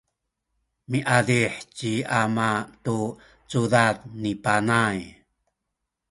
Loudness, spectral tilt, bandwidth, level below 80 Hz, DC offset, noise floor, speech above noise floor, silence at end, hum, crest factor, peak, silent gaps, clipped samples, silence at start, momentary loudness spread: -24 LUFS; -5.5 dB/octave; 11.5 kHz; -58 dBFS; under 0.1%; -82 dBFS; 58 dB; 1 s; none; 22 dB; -2 dBFS; none; under 0.1%; 0.9 s; 10 LU